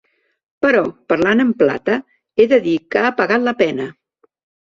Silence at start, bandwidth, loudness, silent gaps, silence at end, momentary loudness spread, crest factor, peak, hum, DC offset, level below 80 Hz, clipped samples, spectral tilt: 0.6 s; 7.4 kHz; -16 LUFS; none; 0.8 s; 8 LU; 16 dB; 0 dBFS; none; under 0.1%; -58 dBFS; under 0.1%; -6.5 dB/octave